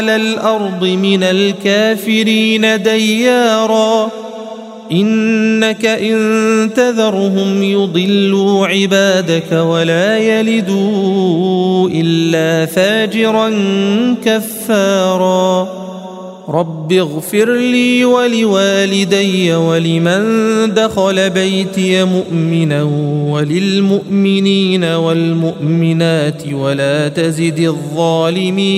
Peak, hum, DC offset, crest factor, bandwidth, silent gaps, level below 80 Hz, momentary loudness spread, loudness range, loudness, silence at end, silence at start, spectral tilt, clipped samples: 0 dBFS; none; under 0.1%; 12 dB; 15.5 kHz; none; -58 dBFS; 4 LU; 2 LU; -12 LUFS; 0 s; 0 s; -5.5 dB/octave; under 0.1%